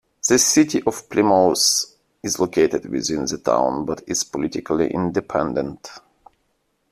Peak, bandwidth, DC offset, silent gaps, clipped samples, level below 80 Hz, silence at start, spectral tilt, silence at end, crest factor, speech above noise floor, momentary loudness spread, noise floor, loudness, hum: -2 dBFS; 15 kHz; under 0.1%; none; under 0.1%; -54 dBFS; 0.25 s; -3 dB/octave; 0.95 s; 18 dB; 49 dB; 11 LU; -69 dBFS; -19 LUFS; none